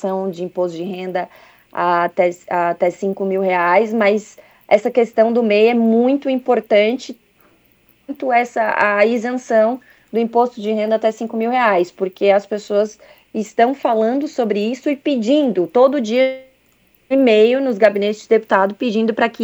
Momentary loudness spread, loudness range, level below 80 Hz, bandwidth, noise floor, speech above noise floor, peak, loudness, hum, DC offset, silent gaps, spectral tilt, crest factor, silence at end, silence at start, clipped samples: 9 LU; 3 LU; -68 dBFS; over 20 kHz; -57 dBFS; 40 dB; 0 dBFS; -17 LUFS; none; under 0.1%; none; -5.5 dB/octave; 16 dB; 0 s; 0 s; under 0.1%